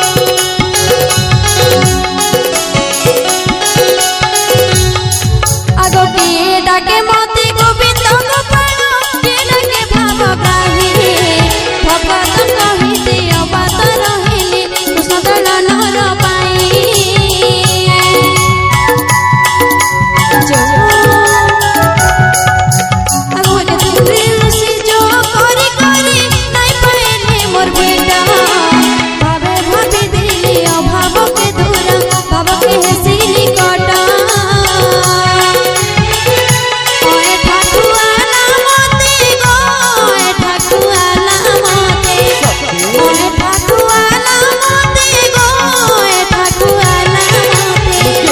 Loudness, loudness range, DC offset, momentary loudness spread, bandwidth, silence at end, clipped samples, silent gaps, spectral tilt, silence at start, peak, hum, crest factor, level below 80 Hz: -8 LUFS; 2 LU; under 0.1%; 3 LU; over 20 kHz; 0 s; 1%; none; -3 dB/octave; 0 s; 0 dBFS; none; 8 dB; -26 dBFS